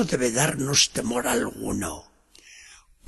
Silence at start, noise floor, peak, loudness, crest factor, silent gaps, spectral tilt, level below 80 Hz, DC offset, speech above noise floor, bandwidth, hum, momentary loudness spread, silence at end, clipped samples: 0 s; -52 dBFS; -6 dBFS; -23 LUFS; 20 dB; none; -3 dB/octave; -50 dBFS; under 0.1%; 27 dB; 13 kHz; none; 11 LU; 0.35 s; under 0.1%